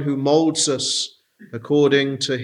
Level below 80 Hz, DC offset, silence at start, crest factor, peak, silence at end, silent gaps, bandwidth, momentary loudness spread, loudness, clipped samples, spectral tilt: -70 dBFS; under 0.1%; 0 s; 16 dB; -4 dBFS; 0 s; none; 11.5 kHz; 13 LU; -19 LUFS; under 0.1%; -4 dB/octave